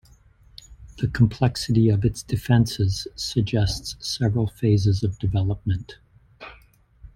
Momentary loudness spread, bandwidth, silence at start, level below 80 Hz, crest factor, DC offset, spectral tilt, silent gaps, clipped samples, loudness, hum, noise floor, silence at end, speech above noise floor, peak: 10 LU; 15.5 kHz; 0.7 s; -42 dBFS; 18 dB; under 0.1%; -6.5 dB/octave; none; under 0.1%; -23 LUFS; none; -54 dBFS; 0.05 s; 32 dB; -4 dBFS